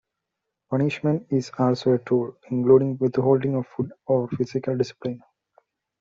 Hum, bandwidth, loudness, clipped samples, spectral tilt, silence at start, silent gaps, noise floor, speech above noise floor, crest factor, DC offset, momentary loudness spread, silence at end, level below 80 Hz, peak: none; 7.6 kHz; -23 LUFS; under 0.1%; -8 dB/octave; 0.7 s; none; -83 dBFS; 60 dB; 18 dB; under 0.1%; 11 LU; 0.85 s; -64 dBFS; -6 dBFS